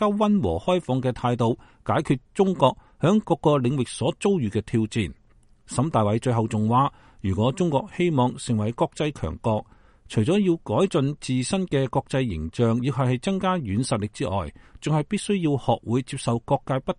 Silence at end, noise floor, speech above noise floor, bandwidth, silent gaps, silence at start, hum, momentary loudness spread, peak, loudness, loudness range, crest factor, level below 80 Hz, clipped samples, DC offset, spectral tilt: 0.05 s; -55 dBFS; 32 dB; 11 kHz; none; 0 s; none; 6 LU; -4 dBFS; -24 LUFS; 2 LU; 20 dB; -48 dBFS; under 0.1%; under 0.1%; -6.5 dB/octave